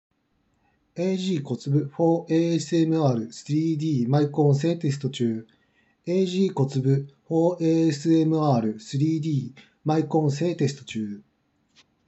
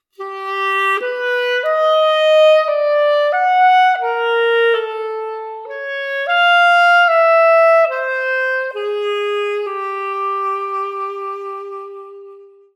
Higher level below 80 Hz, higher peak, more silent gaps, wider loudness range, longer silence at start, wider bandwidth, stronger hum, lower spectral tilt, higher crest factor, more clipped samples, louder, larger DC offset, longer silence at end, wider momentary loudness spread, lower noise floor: first, -76 dBFS vs under -90 dBFS; second, -8 dBFS vs -2 dBFS; neither; second, 2 LU vs 8 LU; first, 0.95 s vs 0.2 s; second, 8.2 kHz vs 12 kHz; neither; first, -7.5 dB/octave vs 1 dB/octave; about the same, 16 dB vs 12 dB; neither; second, -24 LUFS vs -15 LUFS; neither; first, 0.85 s vs 0.3 s; second, 8 LU vs 16 LU; first, -70 dBFS vs -41 dBFS